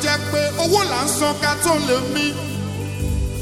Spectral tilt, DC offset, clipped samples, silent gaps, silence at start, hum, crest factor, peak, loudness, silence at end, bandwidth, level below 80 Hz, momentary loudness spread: -3.5 dB/octave; under 0.1%; under 0.1%; none; 0 s; 50 Hz at -40 dBFS; 14 dB; -6 dBFS; -20 LUFS; 0 s; 17 kHz; -34 dBFS; 9 LU